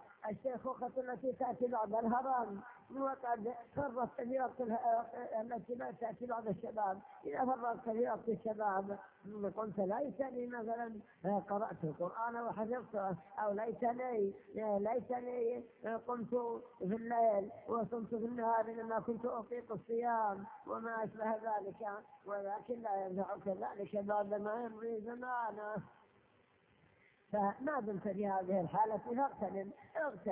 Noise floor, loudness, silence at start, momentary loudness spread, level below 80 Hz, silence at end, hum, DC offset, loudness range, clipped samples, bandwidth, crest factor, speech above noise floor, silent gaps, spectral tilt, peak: -71 dBFS; -40 LUFS; 0 s; 8 LU; -76 dBFS; 0 s; none; under 0.1%; 3 LU; under 0.1%; 3.7 kHz; 16 dB; 32 dB; none; -7.5 dB/octave; -22 dBFS